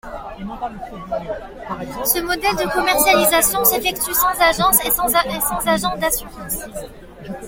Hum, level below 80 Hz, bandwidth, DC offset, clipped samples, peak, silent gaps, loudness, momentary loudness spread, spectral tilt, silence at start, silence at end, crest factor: none; -40 dBFS; 17 kHz; under 0.1%; under 0.1%; 0 dBFS; none; -17 LUFS; 18 LU; -2 dB/octave; 0.05 s; 0 s; 20 dB